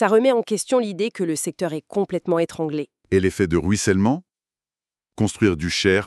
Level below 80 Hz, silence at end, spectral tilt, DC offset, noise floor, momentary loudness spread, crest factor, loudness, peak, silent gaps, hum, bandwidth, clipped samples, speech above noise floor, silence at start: -48 dBFS; 0 s; -5 dB/octave; under 0.1%; under -90 dBFS; 7 LU; 18 dB; -22 LUFS; -2 dBFS; none; 50 Hz at -45 dBFS; 12.5 kHz; under 0.1%; over 70 dB; 0 s